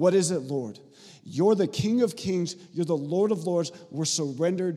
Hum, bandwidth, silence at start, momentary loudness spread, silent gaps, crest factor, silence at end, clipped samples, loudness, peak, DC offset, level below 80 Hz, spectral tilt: none; 14 kHz; 0 s; 10 LU; none; 18 dB; 0 s; under 0.1%; -27 LUFS; -8 dBFS; under 0.1%; -66 dBFS; -5.5 dB/octave